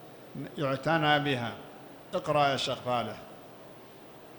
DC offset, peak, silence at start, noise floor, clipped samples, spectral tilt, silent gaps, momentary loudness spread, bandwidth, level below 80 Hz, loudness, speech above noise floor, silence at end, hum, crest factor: under 0.1%; -12 dBFS; 0 s; -50 dBFS; under 0.1%; -5 dB/octave; none; 23 LU; 19.5 kHz; -66 dBFS; -29 LUFS; 21 dB; 0 s; none; 20 dB